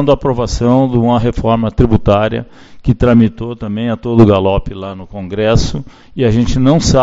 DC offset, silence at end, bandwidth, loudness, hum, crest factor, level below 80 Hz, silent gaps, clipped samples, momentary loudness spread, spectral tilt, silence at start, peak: under 0.1%; 0 s; 8 kHz; -13 LUFS; none; 12 dB; -26 dBFS; none; 0.3%; 14 LU; -7 dB/octave; 0 s; 0 dBFS